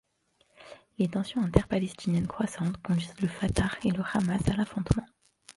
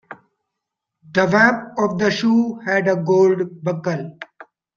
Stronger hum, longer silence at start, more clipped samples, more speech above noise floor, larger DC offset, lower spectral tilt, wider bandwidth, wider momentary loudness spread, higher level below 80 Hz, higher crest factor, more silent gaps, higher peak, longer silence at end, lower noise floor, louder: neither; first, 0.6 s vs 0.1 s; neither; second, 42 dB vs 64 dB; neither; about the same, -6.5 dB/octave vs -6 dB/octave; first, 11.5 kHz vs 7.2 kHz; second, 5 LU vs 12 LU; first, -44 dBFS vs -62 dBFS; first, 26 dB vs 18 dB; neither; about the same, -2 dBFS vs -2 dBFS; first, 0.5 s vs 0.35 s; second, -70 dBFS vs -81 dBFS; second, -29 LUFS vs -18 LUFS